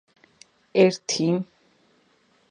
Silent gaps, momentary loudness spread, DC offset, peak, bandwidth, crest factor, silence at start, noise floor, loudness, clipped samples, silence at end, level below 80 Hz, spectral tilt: none; 8 LU; under 0.1%; -4 dBFS; 9.8 kHz; 22 dB; 0.75 s; -63 dBFS; -22 LUFS; under 0.1%; 1.05 s; -74 dBFS; -5 dB/octave